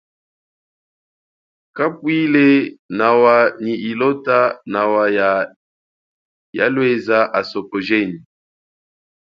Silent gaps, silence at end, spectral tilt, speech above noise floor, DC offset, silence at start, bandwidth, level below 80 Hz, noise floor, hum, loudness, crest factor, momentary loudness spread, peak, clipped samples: 2.79-2.89 s, 5.56-6.53 s; 1.1 s; -7.5 dB/octave; over 74 dB; under 0.1%; 1.75 s; 6.6 kHz; -66 dBFS; under -90 dBFS; none; -16 LUFS; 18 dB; 11 LU; 0 dBFS; under 0.1%